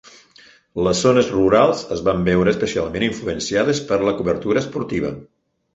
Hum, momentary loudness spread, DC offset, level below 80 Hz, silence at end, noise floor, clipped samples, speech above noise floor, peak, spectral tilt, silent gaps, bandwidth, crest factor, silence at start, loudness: none; 9 LU; under 0.1%; -44 dBFS; 0.5 s; -50 dBFS; under 0.1%; 32 dB; -2 dBFS; -5.5 dB/octave; none; 8.4 kHz; 18 dB; 0.75 s; -19 LUFS